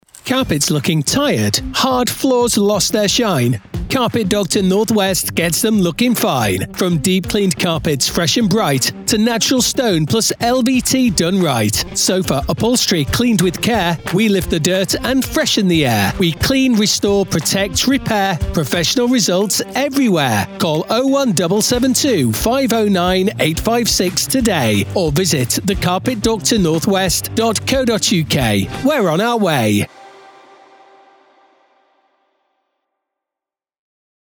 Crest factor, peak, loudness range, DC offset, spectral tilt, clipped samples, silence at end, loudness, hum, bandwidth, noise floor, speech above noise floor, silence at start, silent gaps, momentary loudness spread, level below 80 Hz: 16 dB; 0 dBFS; 1 LU; under 0.1%; -4 dB/octave; under 0.1%; 4.1 s; -15 LUFS; none; over 20 kHz; -87 dBFS; 72 dB; 0.25 s; none; 3 LU; -36 dBFS